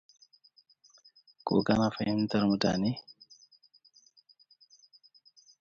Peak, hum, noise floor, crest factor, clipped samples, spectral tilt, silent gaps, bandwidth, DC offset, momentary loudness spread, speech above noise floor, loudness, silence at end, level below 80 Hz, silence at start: -12 dBFS; none; -64 dBFS; 22 dB; under 0.1%; -6.5 dB/octave; none; 7.6 kHz; under 0.1%; 14 LU; 36 dB; -29 LUFS; 2.5 s; -60 dBFS; 1.45 s